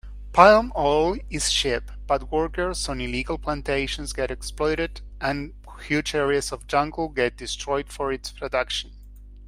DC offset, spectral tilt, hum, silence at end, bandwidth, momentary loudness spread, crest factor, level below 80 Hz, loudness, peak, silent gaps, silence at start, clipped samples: under 0.1%; -3.5 dB/octave; 50 Hz at -35 dBFS; 0 s; 16 kHz; 10 LU; 24 dB; -38 dBFS; -24 LUFS; 0 dBFS; none; 0.05 s; under 0.1%